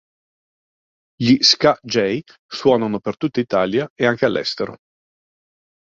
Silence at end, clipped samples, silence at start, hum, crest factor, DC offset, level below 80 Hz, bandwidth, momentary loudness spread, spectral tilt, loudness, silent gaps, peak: 1.1 s; under 0.1%; 1.2 s; none; 20 dB; under 0.1%; -58 dBFS; 7.8 kHz; 12 LU; -4.5 dB/octave; -18 LUFS; 2.39-2.49 s, 3.90-3.96 s; 0 dBFS